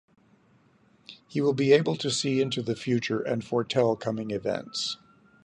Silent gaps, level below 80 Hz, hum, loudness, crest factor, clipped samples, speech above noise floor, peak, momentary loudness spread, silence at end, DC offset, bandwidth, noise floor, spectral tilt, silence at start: none; -68 dBFS; none; -27 LUFS; 20 dB; under 0.1%; 36 dB; -8 dBFS; 9 LU; 0.5 s; under 0.1%; 10.5 kHz; -62 dBFS; -5 dB/octave; 1.1 s